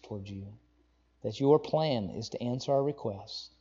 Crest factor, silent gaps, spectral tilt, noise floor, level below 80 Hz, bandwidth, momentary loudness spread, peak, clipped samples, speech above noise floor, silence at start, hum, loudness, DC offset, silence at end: 22 dB; none; -7 dB/octave; -68 dBFS; -66 dBFS; 7.6 kHz; 16 LU; -10 dBFS; under 0.1%; 37 dB; 0.05 s; none; -31 LUFS; under 0.1%; 0.15 s